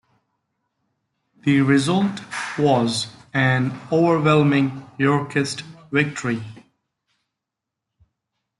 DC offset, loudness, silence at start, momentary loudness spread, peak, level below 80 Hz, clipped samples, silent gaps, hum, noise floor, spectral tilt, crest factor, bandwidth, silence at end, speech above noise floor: under 0.1%; -20 LUFS; 1.45 s; 10 LU; -4 dBFS; -62 dBFS; under 0.1%; none; none; -84 dBFS; -6 dB/octave; 18 dB; 11.5 kHz; 2.05 s; 65 dB